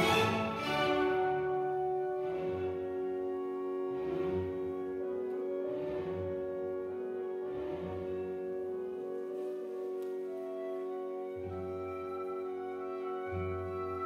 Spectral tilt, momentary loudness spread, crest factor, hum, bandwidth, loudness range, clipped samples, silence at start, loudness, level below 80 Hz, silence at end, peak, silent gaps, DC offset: -6 dB/octave; 8 LU; 20 dB; none; 14.5 kHz; 6 LU; under 0.1%; 0 s; -36 LUFS; -64 dBFS; 0 s; -16 dBFS; none; under 0.1%